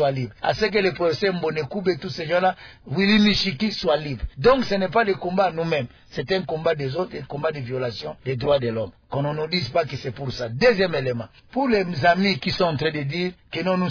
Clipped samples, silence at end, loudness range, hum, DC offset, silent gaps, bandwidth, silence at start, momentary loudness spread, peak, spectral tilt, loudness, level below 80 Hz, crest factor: under 0.1%; 0 s; 5 LU; none; under 0.1%; none; 5.4 kHz; 0 s; 11 LU; -6 dBFS; -6.5 dB/octave; -23 LUFS; -46 dBFS; 16 dB